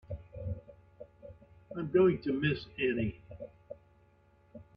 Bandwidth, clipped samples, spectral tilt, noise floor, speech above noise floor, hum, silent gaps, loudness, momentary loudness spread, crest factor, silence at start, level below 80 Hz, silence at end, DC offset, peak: 5.4 kHz; under 0.1%; -9.5 dB/octave; -65 dBFS; 35 dB; none; none; -32 LUFS; 26 LU; 20 dB; 0.1 s; -58 dBFS; 0.15 s; under 0.1%; -16 dBFS